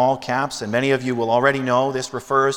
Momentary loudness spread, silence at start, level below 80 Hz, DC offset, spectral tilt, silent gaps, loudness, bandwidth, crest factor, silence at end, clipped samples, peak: 5 LU; 0 s; -58 dBFS; under 0.1%; -5 dB/octave; none; -20 LUFS; 16.5 kHz; 18 dB; 0 s; under 0.1%; -2 dBFS